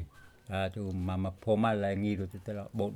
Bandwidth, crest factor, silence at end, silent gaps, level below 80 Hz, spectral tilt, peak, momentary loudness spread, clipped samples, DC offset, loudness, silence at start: 13 kHz; 16 dB; 0 s; none; -62 dBFS; -8 dB/octave; -16 dBFS; 10 LU; under 0.1%; under 0.1%; -33 LUFS; 0 s